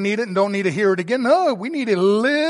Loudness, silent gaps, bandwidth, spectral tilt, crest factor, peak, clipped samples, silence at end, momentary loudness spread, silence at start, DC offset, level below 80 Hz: -19 LUFS; none; 11.5 kHz; -6 dB/octave; 14 dB; -4 dBFS; under 0.1%; 0 s; 4 LU; 0 s; under 0.1%; -72 dBFS